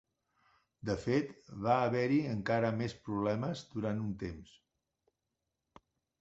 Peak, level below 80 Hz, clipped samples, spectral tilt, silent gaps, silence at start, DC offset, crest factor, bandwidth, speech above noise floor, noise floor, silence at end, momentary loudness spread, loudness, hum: -14 dBFS; -62 dBFS; under 0.1%; -6 dB/octave; none; 0.85 s; under 0.1%; 22 dB; 8 kHz; 53 dB; -87 dBFS; 1.75 s; 12 LU; -35 LUFS; none